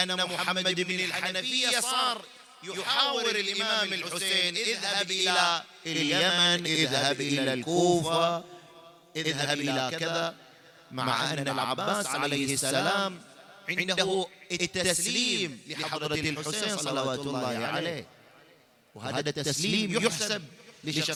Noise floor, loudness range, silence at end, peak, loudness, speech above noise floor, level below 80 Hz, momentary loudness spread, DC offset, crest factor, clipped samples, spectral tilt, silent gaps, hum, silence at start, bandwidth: -60 dBFS; 6 LU; 0 s; -8 dBFS; -27 LUFS; 31 dB; -68 dBFS; 9 LU; under 0.1%; 22 dB; under 0.1%; -2.5 dB/octave; none; none; 0 s; 18.5 kHz